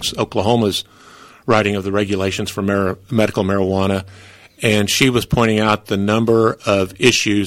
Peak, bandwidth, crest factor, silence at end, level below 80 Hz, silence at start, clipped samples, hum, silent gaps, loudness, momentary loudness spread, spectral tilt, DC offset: 0 dBFS; 16.5 kHz; 16 dB; 0 s; -44 dBFS; 0 s; under 0.1%; none; none; -17 LUFS; 7 LU; -4.5 dB/octave; under 0.1%